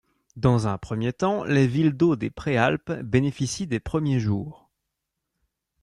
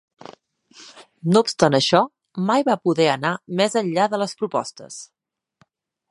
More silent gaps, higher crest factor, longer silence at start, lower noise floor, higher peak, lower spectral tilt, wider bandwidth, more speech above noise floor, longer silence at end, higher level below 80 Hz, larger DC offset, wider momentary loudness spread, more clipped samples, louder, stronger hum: neither; about the same, 18 dB vs 22 dB; second, 0.35 s vs 0.8 s; first, -82 dBFS vs -65 dBFS; second, -6 dBFS vs 0 dBFS; first, -6.5 dB/octave vs -5 dB/octave; about the same, 11 kHz vs 11.5 kHz; first, 59 dB vs 45 dB; first, 1.3 s vs 1.05 s; first, -50 dBFS vs -64 dBFS; neither; second, 7 LU vs 13 LU; neither; second, -24 LUFS vs -20 LUFS; neither